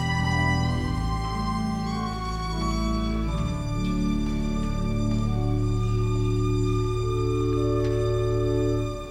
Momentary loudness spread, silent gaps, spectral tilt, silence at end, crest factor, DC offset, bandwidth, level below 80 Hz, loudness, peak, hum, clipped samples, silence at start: 4 LU; none; -7 dB/octave; 0 s; 12 dB; under 0.1%; 11.5 kHz; -32 dBFS; -26 LUFS; -12 dBFS; none; under 0.1%; 0 s